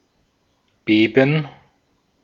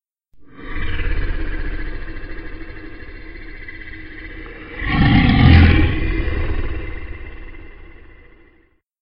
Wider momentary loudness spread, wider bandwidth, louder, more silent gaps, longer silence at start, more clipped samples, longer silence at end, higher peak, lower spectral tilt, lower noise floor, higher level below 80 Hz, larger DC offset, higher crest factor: second, 17 LU vs 25 LU; first, 6.8 kHz vs 5.4 kHz; about the same, -17 LUFS vs -17 LUFS; neither; first, 0.85 s vs 0.35 s; neither; second, 0.75 s vs 1.05 s; about the same, 0 dBFS vs 0 dBFS; second, -8 dB/octave vs -10.5 dB/octave; first, -65 dBFS vs -56 dBFS; second, -64 dBFS vs -24 dBFS; neither; about the same, 20 dB vs 18 dB